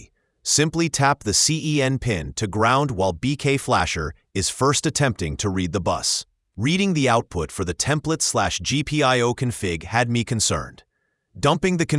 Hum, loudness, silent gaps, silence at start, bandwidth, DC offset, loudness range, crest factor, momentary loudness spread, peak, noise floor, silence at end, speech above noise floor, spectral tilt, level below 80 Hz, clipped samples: none; -21 LUFS; none; 0 s; 12 kHz; under 0.1%; 2 LU; 20 dB; 8 LU; -2 dBFS; -70 dBFS; 0 s; 49 dB; -4 dB/octave; -44 dBFS; under 0.1%